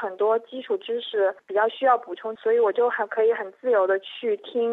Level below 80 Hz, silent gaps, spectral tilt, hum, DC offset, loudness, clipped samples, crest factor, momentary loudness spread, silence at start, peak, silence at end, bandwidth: -88 dBFS; none; -5.5 dB/octave; none; under 0.1%; -24 LUFS; under 0.1%; 16 dB; 7 LU; 0 s; -8 dBFS; 0 s; 4.1 kHz